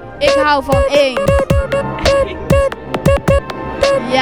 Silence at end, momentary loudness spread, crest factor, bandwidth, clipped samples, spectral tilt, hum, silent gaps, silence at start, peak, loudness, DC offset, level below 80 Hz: 0 s; 4 LU; 14 dB; over 20 kHz; under 0.1%; -5.5 dB/octave; none; none; 0 s; 0 dBFS; -14 LUFS; 0.6%; -24 dBFS